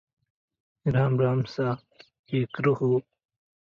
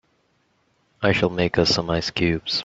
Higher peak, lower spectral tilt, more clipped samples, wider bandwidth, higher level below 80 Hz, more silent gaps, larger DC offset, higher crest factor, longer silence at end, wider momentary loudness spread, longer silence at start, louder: second, -12 dBFS vs -4 dBFS; first, -9 dB/octave vs -5 dB/octave; neither; second, 6.6 kHz vs 8 kHz; second, -60 dBFS vs -48 dBFS; first, 2.19-2.24 s vs none; neither; about the same, 16 dB vs 20 dB; first, 0.6 s vs 0 s; first, 8 LU vs 4 LU; second, 0.85 s vs 1 s; second, -26 LUFS vs -21 LUFS